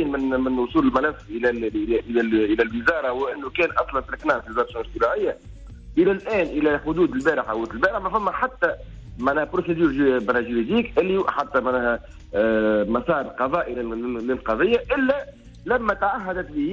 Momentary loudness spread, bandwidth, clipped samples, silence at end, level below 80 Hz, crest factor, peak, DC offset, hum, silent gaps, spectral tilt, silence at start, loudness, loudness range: 7 LU; 8 kHz; under 0.1%; 0 s; -44 dBFS; 14 dB; -8 dBFS; under 0.1%; none; none; -7 dB/octave; 0 s; -23 LUFS; 2 LU